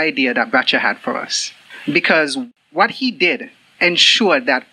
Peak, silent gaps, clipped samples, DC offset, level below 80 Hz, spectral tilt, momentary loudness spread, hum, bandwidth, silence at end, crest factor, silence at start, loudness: 0 dBFS; none; under 0.1%; under 0.1%; -78 dBFS; -2.5 dB/octave; 14 LU; none; 12 kHz; 0.1 s; 18 dB; 0 s; -15 LUFS